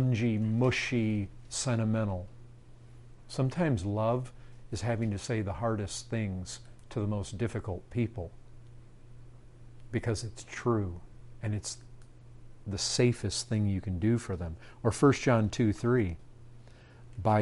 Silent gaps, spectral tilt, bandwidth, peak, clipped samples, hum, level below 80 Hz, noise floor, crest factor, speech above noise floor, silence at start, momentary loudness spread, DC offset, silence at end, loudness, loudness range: none; -6 dB/octave; 11.5 kHz; -12 dBFS; under 0.1%; none; -52 dBFS; -52 dBFS; 20 dB; 21 dB; 0 s; 14 LU; under 0.1%; 0 s; -31 LUFS; 8 LU